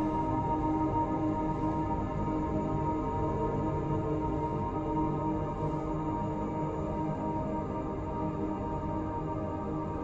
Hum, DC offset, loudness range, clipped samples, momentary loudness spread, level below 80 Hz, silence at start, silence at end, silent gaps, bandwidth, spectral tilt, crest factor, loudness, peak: none; under 0.1%; 3 LU; under 0.1%; 4 LU; -44 dBFS; 0 s; 0 s; none; 7.6 kHz; -9.5 dB/octave; 14 dB; -33 LUFS; -18 dBFS